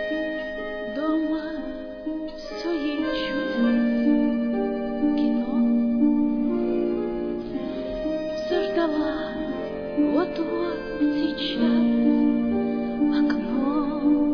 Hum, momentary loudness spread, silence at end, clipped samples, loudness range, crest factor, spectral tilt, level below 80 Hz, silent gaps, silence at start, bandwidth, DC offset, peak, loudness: none; 9 LU; 0 s; under 0.1%; 4 LU; 14 dB; -7 dB/octave; -48 dBFS; none; 0 s; 5.4 kHz; under 0.1%; -10 dBFS; -24 LUFS